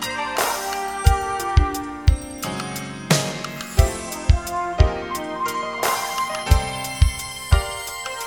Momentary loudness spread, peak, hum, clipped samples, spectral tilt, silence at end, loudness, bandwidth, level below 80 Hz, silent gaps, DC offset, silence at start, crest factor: 8 LU; 0 dBFS; none; under 0.1%; -4.5 dB/octave; 0 s; -22 LUFS; 19.5 kHz; -24 dBFS; none; 0.1%; 0 s; 20 dB